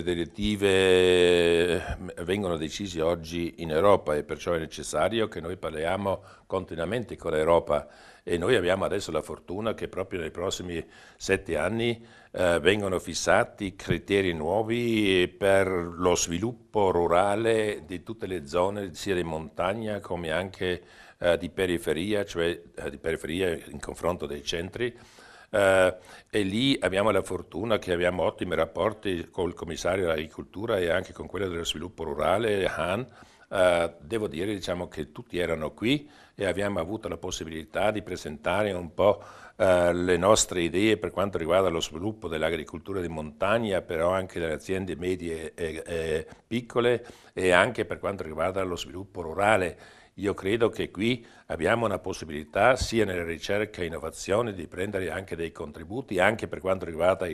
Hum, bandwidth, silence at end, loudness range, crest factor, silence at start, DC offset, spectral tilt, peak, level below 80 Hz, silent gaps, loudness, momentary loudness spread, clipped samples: none; 13.5 kHz; 0 s; 5 LU; 24 dB; 0 s; under 0.1%; -4.5 dB/octave; -2 dBFS; -50 dBFS; none; -27 LUFS; 11 LU; under 0.1%